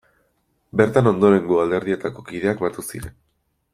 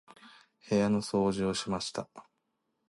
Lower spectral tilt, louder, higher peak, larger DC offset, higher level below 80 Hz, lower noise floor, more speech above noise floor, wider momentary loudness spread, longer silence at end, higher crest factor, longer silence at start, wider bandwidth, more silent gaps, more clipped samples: first, -7 dB/octave vs -5.5 dB/octave; first, -20 LUFS vs -31 LUFS; first, -2 dBFS vs -16 dBFS; neither; first, -52 dBFS vs -62 dBFS; second, -67 dBFS vs -80 dBFS; about the same, 48 dB vs 50 dB; first, 16 LU vs 11 LU; about the same, 0.65 s vs 0.7 s; about the same, 18 dB vs 16 dB; first, 0.75 s vs 0.25 s; first, 14.5 kHz vs 11.5 kHz; neither; neither